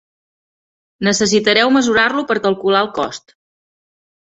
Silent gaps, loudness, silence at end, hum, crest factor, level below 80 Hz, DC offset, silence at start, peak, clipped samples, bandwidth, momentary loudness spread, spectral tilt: none; -15 LUFS; 1.1 s; none; 16 dB; -56 dBFS; under 0.1%; 1 s; 0 dBFS; under 0.1%; 8.2 kHz; 10 LU; -3.5 dB/octave